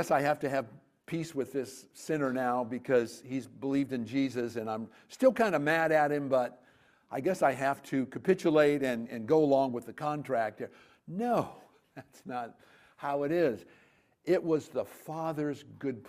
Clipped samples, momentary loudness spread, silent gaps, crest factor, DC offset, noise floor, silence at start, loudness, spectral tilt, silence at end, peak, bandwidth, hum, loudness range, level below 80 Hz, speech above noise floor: under 0.1%; 14 LU; none; 20 dB; under 0.1%; -65 dBFS; 0 s; -31 LUFS; -6 dB/octave; 0 s; -12 dBFS; 15.5 kHz; none; 6 LU; -74 dBFS; 35 dB